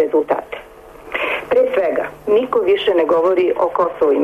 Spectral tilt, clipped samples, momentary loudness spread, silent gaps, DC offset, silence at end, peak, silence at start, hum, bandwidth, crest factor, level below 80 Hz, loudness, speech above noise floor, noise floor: -5.5 dB/octave; under 0.1%; 8 LU; none; under 0.1%; 0 s; -6 dBFS; 0 s; none; 13.5 kHz; 12 dB; -52 dBFS; -17 LUFS; 23 dB; -38 dBFS